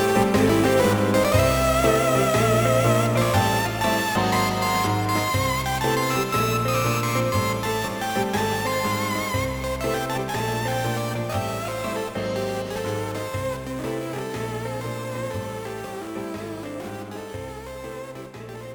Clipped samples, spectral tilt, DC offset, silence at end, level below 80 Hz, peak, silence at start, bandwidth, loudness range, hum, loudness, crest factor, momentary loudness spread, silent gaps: under 0.1%; -5 dB/octave; under 0.1%; 0 s; -42 dBFS; -6 dBFS; 0 s; over 20 kHz; 11 LU; none; -23 LUFS; 16 dB; 14 LU; none